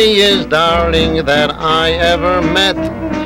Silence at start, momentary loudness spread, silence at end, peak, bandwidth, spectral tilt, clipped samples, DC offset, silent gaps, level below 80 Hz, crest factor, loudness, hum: 0 s; 3 LU; 0 s; -2 dBFS; 16 kHz; -4.5 dB/octave; under 0.1%; under 0.1%; none; -28 dBFS; 10 dB; -12 LUFS; none